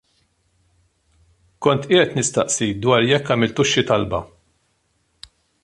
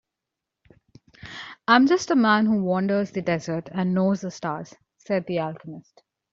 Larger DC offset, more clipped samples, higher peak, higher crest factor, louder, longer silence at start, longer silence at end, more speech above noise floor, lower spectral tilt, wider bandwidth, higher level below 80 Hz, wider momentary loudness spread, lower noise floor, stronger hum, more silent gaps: neither; neither; first, 0 dBFS vs -4 dBFS; about the same, 20 dB vs 22 dB; first, -18 LUFS vs -23 LUFS; first, 1.6 s vs 1.25 s; first, 1.4 s vs 0.55 s; second, 48 dB vs 63 dB; second, -4 dB/octave vs -6 dB/octave; first, 11.5 kHz vs 7.6 kHz; first, -50 dBFS vs -64 dBFS; second, 5 LU vs 20 LU; second, -66 dBFS vs -85 dBFS; neither; neither